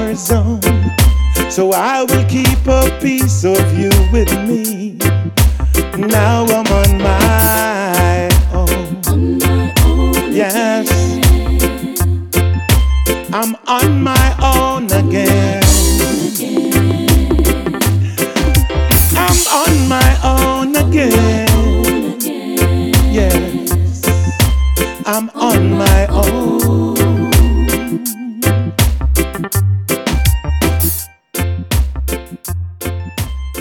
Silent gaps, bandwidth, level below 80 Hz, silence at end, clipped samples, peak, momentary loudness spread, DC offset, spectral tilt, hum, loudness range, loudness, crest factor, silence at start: none; over 20 kHz; -18 dBFS; 0 s; under 0.1%; 0 dBFS; 6 LU; under 0.1%; -5 dB/octave; none; 3 LU; -13 LUFS; 12 dB; 0 s